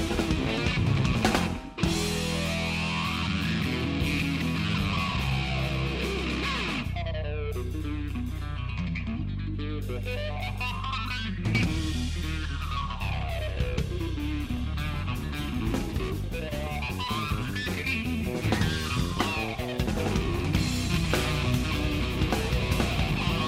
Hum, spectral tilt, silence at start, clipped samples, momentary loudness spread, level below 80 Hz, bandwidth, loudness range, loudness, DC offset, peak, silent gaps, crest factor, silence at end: none; -5.5 dB/octave; 0 s; under 0.1%; 6 LU; -36 dBFS; 16 kHz; 5 LU; -29 LUFS; under 0.1%; -10 dBFS; none; 18 dB; 0 s